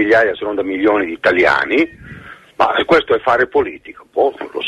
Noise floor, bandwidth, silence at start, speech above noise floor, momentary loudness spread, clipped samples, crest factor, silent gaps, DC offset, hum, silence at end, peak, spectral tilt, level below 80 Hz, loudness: -37 dBFS; 11.5 kHz; 0 s; 21 dB; 12 LU; under 0.1%; 14 dB; none; under 0.1%; none; 0 s; -2 dBFS; -5.5 dB/octave; -48 dBFS; -15 LUFS